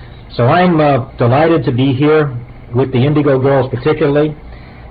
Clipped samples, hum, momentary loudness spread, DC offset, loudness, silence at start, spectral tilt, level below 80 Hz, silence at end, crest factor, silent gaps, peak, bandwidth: under 0.1%; none; 9 LU; 0.2%; -12 LUFS; 0 s; -11.5 dB/octave; -38 dBFS; 0 s; 10 dB; none; -2 dBFS; 5 kHz